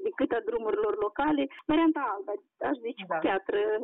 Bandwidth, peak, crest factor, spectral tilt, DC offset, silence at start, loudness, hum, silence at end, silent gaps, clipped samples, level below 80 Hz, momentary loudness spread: 4 kHz; -16 dBFS; 12 dB; -3 dB/octave; under 0.1%; 0 s; -29 LUFS; none; 0 s; none; under 0.1%; -60 dBFS; 8 LU